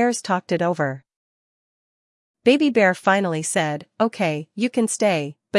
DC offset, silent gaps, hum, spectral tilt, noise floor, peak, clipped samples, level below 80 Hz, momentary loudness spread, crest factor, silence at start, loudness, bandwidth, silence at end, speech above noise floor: under 0.1%; 1.16-2.34 s; none; -4.5 dB/octave; under -90 dBFS; -2 dBFS; under 0.1%; -74 dBFS; 8 LU; 20 dB; 0 s; -21 LUFS; 12 kHz; 0 s; over 70 dB